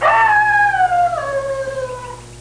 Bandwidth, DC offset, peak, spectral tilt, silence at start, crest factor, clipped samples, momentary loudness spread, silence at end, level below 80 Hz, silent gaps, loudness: 10.5 kHz; 0.1%; -4 dBFS; -3.5 dB/octave; 0 s; 12 dB; under 0.1%; 15 LU; 0 s; -44 dBFS; none; -15 LUFS